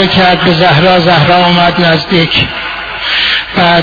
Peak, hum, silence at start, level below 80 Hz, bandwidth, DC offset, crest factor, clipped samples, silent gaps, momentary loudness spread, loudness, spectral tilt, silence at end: 0 dBFS; none; 0 s; -34 dBFS; 5.4 kHz; under 0.1%; 8 dB; 0.7%; none; 7 LU; -8 LUFS; -6.5 dB/octave; 0 s